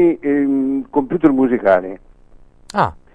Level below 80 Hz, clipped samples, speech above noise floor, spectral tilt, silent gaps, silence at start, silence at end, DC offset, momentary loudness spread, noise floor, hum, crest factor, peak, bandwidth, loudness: -46 dBFS; under 0.1%; 29 dB; -8 dB/octave; none; 0 s; 0.2 s; under 0.1%; 9 LU; -44 dBFS; none; 16 dB; 0 dBFS; 10.5 kHz; -17 LUFS